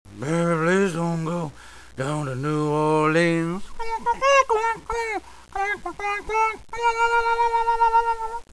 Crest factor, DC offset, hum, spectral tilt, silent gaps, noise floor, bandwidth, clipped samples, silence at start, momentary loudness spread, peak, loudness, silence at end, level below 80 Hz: 18 dB; 0.4%; none; -5.5 dB/octave; none; -44 dBFS; 11 kHz; under 0.1%; 0.1 s; 10 LU; -4 dBFS; -23 LUFS; 0.1 s; -46 dBFS